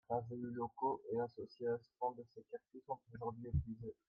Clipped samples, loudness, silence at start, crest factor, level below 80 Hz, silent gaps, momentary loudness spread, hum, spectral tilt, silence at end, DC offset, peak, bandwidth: under 0.1%; -44 LUFS; 0.1 s; 18 dB; -58 dBFS; none; 12 LU; none; -10.5 dB/octave; 0.15 s; under 0.1%; -26 dBFS; 5.4 kHz